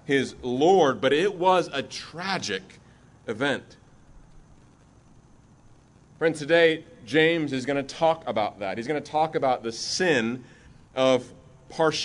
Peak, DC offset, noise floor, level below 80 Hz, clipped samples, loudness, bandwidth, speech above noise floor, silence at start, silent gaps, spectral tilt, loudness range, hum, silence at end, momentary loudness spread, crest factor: -6 dBFS; under 0.1%; -55 dBFS; -60 dBFS; under 0.1%; -24 LUFS; 11 kHz; 30 dB; 0.05 s; none; -4.5 dB/octave; 10 LU; none; 0 s; 12 LU; 20 dB